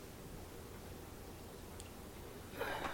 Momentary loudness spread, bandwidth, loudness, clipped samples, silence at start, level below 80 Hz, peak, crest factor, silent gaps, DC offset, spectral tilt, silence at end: 8 LU; 17.5 kHz; -49 LUFS; under 0.1%; 0 s; -58 dBFS; -28 dBFS; 20 dB; none; under 0.1%; -4 dB/octave; 0 s